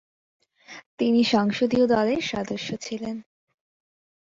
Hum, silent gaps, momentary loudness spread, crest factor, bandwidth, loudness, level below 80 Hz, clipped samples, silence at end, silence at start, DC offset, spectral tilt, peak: none; 0.86-0.98 s; 20 LU; 18 dB; 7.6 kHz; -24 LUFS; -60 dBFS; under 0.1%; 1 s; 0.7 s; under 0.1%; -5 dB/octave; -8 dBFS